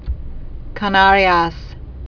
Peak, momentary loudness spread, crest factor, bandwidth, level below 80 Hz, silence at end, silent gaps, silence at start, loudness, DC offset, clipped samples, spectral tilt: 0 dBFS; 24 LU; 16 dB; 5.4 kHz; -30 dBFS; 0.1 s; none; 0 s; -14 LUFS; under 0.1%; under 0.1%; -6 dB/octave